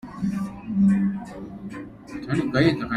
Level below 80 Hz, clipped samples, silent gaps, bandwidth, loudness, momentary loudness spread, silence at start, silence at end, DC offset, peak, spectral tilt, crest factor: -50 dBFS; under 0.1%; none; 10.5 kHz; -23 LUFS; 17 LU; 0.05 s; 0 s; under 0.1%; -6 dBFS; -7.5 dB/octave; 18 dB